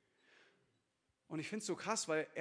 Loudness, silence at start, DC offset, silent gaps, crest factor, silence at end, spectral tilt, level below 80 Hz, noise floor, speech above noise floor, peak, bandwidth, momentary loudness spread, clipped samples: -41 LUFS; 1.3 s; under 0.1%; none; 22 dB; 0 s; -3 dB/octave; -90 dBFS; -83 dBFS; 43 dB; -22 dBFS; 10.5 kHz; 9 LU; under 0.1%